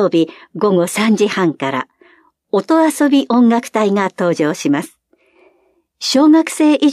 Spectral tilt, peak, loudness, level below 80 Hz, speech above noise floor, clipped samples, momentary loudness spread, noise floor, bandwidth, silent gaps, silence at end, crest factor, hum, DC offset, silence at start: -5 dB/octave; -2 dBFS; -14 LUFS; -70 dBFS; 45 dB; under 0.1%; 9 LU; -59 dBFS; 15 kHz; none; 0 s; 14 dB; none; under 0.1%; 0 s